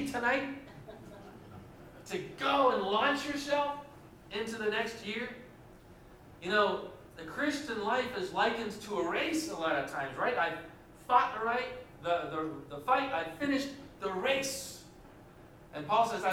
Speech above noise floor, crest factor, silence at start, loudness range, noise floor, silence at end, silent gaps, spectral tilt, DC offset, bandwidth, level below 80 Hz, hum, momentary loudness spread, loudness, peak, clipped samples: 22 dB; 22 dB; 0 s; 3 LU; -55 dBFS; 0 s; none; -3.5 dB/octave; under 0.1%; 17 kHz; -64 dBFS; none; 21 LU; -33 LUFS; -12 dBFS; under 0.1%